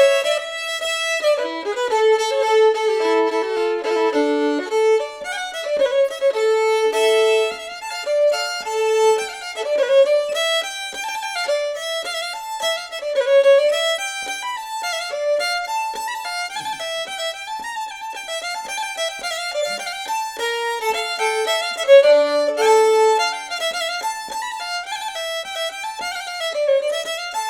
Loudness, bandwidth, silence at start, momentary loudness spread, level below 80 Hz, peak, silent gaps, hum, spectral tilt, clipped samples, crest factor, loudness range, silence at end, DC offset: -20 LUFS; 17 kHz; 0 s; 11 LU; -64 dBFS; -2 dBFS; none; none; 0 dB/octave; under 0.1%; 18 dB; 8 LU; 0 s; under 0.1%